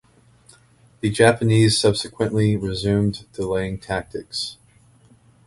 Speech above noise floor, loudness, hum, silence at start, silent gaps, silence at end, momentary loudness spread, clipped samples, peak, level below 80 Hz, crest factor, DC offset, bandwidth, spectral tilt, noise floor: 34 dB; -21 LUFS; none; 1.05 s; none; 0.95 s; 12 LU; under 0.1%; 0 dBFS; -46 dBFS; 22 dB; under 0.1%; 11.5 kHz; -5.5 dB/octave; -54 dBFS